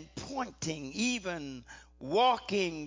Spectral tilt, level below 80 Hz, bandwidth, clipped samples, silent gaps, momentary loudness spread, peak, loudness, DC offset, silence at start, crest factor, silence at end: -3.5 dB/octave; -60 dBFS; 7.8 kHz; under 0.1%; none; 18 LU; -16 dBFS; -32 LUFS; under 0.1%; 0 s; 18 dB; 0 s